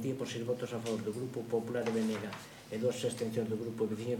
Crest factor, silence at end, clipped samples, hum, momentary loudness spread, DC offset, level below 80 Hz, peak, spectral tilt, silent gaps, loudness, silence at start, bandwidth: 16 dB; 0 s; under 0.1%; none; 6 LU; under 0.1%; -72 dBFS; -20 dBFS; -5.5 dB/octave; none; -36 LUFS; 0 s; 17 kHz